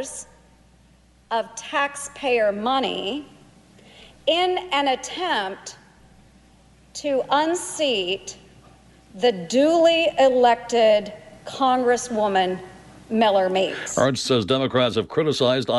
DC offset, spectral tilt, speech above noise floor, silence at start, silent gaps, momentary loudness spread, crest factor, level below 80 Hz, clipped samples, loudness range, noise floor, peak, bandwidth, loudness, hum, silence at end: under 0.1%; -4 dB/octave; 34 dB; 0 s; none; 13 LU; 16 dB; -58 dBFS; under 0.1%; 6 LU; -55 dBFS; -6 dBFS; 11.5 kHz; -21 LUFS; none; 0 s